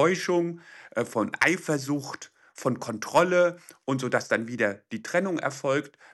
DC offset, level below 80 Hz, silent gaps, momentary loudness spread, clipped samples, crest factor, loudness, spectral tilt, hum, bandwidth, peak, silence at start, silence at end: under 0.1%; -74 dBFS; none; 12 LU; under 0.1%; 18 dB; -27 LUFS; -5 dB/octave; none; 12.5 kHz; -8 dBFS; 0 s; 0.25 s